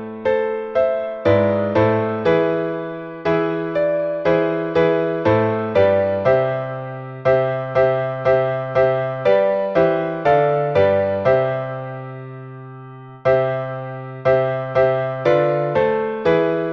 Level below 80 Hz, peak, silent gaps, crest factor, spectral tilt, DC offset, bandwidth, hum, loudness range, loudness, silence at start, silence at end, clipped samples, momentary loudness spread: -52 dBFS; -4 dBFS; none; 14 dB; -8.5 dB/octave; under 0.1%; 6.2 kHz; none; 3 LU; -18 LUFS; 0 s; 0 s; under 0.1%; 12 LU